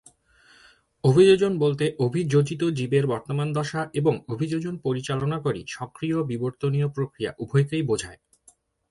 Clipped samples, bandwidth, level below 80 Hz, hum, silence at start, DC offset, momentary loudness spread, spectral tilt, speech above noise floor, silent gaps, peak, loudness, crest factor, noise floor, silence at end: under 0.1%; 11.5 kHz; -58 dBFS; none; 1.05 s; under 0.1%; 10 LU; -7 dB/octave; 36 dB; none; -6 dBFS; -24 LUFS; 18 dB; -60 dBFS; 0.75 s